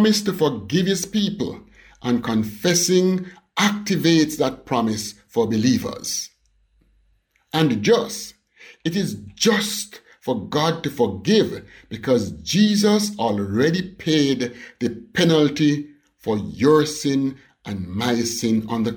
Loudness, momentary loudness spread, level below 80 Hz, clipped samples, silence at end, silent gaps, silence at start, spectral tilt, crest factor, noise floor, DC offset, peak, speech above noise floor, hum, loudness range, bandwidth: -21 LUFS; 12 LU; -54 dBFS; under 0.1%; 0 s; none; 0 s; -4.5 dB/octave; 16 dB; -63 dBFS; under 0.1%; -6 dBFS; 43 dB; none; 4 LU; 19 kHz